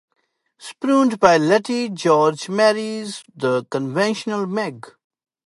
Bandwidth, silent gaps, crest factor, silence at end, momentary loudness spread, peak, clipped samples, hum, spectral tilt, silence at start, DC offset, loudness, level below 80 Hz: 11.5 kHz; none; 20 dB; 0.6 s; 14 LU; 0 dBFS; under 0.1%; none; -5 dB/octave; 0.6 s; under 0.1%; -19 LUFS; -64 dBFS